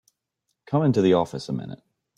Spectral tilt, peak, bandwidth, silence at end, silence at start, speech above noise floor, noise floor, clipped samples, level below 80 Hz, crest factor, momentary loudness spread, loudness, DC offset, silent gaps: -7.5 dB/octave; -8 dBFS; 11 kHz; 0.45 s; 0.7 s; 56 dB; -78 dBFS; under 0.1%; -62 dBFS; 18 dB; 13 LU; -23 LUFS; under 0.1%; none